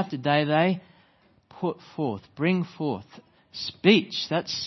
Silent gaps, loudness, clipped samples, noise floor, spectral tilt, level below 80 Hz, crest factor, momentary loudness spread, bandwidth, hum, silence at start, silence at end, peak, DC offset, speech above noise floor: none; -26 LUFS; under 0.1%; -62 dBFS; -6 dB/octave; -68 dBFS; 22 dB; 14 LU; 6.2 kHz; none; 0 s; 0 s; -4 dBFS; under 0.1%; 36 dB